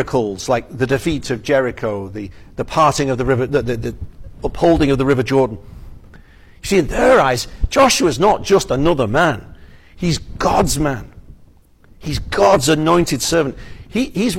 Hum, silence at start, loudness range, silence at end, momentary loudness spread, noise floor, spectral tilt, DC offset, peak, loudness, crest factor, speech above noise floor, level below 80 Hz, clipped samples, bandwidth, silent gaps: none; 0 s; 4 LU; 0 s; 15 LU; -47 dBFS; -5 dB/octave; under 0.1%; -2 dBFS; -16 LUFS; 14 dB; 31 dB; -32 dBFS; under 0.1%; 16.5 kHz; none